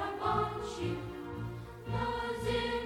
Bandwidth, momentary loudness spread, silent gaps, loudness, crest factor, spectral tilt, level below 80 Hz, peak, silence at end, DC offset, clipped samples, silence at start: 17.5 kHz; 10 LU; none; -36 LUFS; 16 dB; -6 dB/octave; -50 dBFS; -18 dBFS; 0 s; under 0.1%; under 0.1%; 0 s